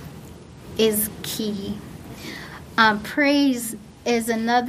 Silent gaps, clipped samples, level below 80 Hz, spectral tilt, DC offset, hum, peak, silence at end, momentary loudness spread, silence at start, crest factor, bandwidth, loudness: none; under 0.1%; -50 dBFS; -3.5 dB/octave; under 0.1%; none; -2 dBFS; 0 s; 20 LU; 0 s; 22 dB; 15.5 kHz; -22 LUFS